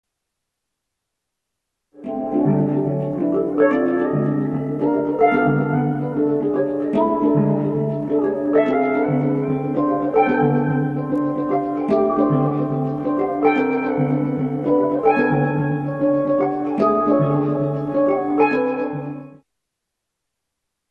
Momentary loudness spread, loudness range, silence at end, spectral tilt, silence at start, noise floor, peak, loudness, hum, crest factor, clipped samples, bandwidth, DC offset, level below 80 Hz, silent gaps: 5 LU; 2 LU; 1.6 s; -10.5 dB/octave; 1.95 s; -80 dBFS; -2 dBFS; -19 LUFS; none; 16 dB; under 0.1%; 5.2 kHz; under 0.1%; -54 dBFS; none